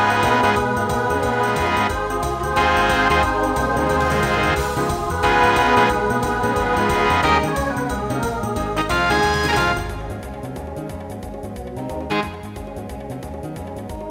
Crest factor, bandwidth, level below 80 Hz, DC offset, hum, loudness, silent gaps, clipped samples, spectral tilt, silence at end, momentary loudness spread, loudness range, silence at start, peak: 16 dB; 16 kHz; -34 dBFS; under 0.1%; none; -19 LUFS; none; under 0.1%; -5 dB/octave; 0 s; 15 LU; 11 LU; 0 s; -4 dBFS